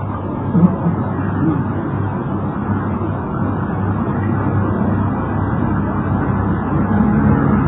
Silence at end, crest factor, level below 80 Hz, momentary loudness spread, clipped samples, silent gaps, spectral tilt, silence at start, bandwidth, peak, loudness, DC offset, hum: 0 s; 16 dB; -32 dBFS; 7 LU; under 0.1%; none; -13.5 dB/octave; 0 s; 3.8 kHz; 0 dBFS; -18 LUFS; under 0.1%; none